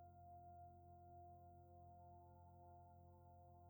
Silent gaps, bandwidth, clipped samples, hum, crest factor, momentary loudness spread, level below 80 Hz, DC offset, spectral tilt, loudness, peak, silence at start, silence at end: none; over 20 kHz; under 0.1%; none; 10 dB; 4 LU; -76 dBFS; under 0.1%; -9 dB/octave; -65 LUFS; -54 dBFS; 0 s; 0 s